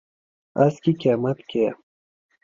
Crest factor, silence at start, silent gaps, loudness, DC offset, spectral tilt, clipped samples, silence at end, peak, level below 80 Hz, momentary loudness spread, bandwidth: 20 dB; 0.55 s; none; -22 LUFS; under 0.1%; -8.5 dB/octave; under 0.1%; 0.7 s; -4 dBFS; -64 dBFS; 6 LU; 7.6 kHz